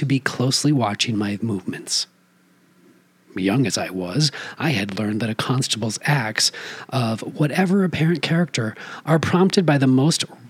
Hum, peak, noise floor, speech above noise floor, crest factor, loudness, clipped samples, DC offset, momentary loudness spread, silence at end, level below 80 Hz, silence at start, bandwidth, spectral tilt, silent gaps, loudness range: none; -2 dBFS; -57 dBFS; 37 dB; 20 dB; -21 LUFS; under 0.1%; under 0.1%; 9 LU; 0 s; -66 dBFS; 0 s; 15.5 kHz; -4.5 dB/octave; none; 5 LU